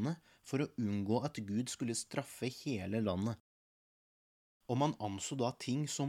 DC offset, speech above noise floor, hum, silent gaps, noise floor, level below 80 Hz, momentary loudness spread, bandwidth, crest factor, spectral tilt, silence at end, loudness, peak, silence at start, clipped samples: under 0.1%; over 53 dB; none; 3.40-4.60 s; under -90 dBFS; -72 dBFS; 6 LU; 16 kHz; 18 dB; -5.5 dB/octave; 0 s; -38 LUFS; -20 dBFS; 0 s; under 0.1%